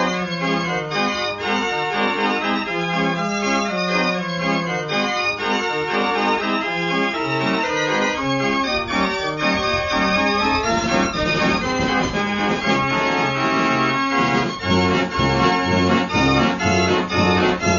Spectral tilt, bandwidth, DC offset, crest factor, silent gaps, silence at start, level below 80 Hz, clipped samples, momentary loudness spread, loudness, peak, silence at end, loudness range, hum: -4.5 dB/octave; 7.4 kHz; under 0.1%; 16 dB; none; 0 s; -42 dBFS; under 0.1%; 4 LU; -19 LUFS; -4 dBFS; 0 s; 3 LU; none